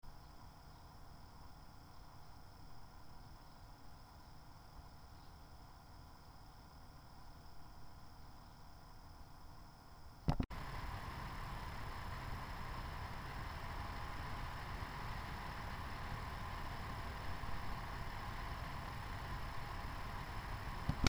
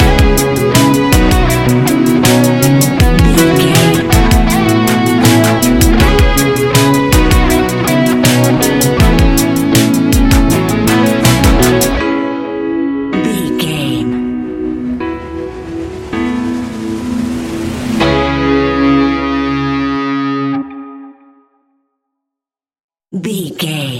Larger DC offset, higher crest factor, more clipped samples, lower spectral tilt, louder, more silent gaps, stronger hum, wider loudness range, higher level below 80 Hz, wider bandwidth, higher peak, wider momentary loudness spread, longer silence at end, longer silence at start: neither; first, 36 dB vs 10 dB; neither; about the same, -5 dB/octave vs -5 dB/octave; second, -49 LUFS vs -11 LUFS; second, none vs 22.80-22.88 s; neither; first, 13 LU vs 9 LU; second, -52 dBFS vs -18 dBFS; first, over 20 kHz vs 17.5 kHz; second, -12 dBFS vs 0 dBFS; first, 13 LU vs 10 LU; about the same, 0 s vs 0 s; about the same, 0.05 s vs 0 s